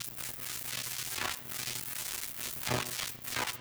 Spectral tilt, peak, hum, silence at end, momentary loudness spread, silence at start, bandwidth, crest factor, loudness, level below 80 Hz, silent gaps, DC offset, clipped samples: -1.5 dB/octave; -18 dBFS; none; 0 s; 4 LU; 0 s; over 20 kHz; 20 dB; -35 LUFS; -62 dBFS; none; under 0.1%; under 0.1%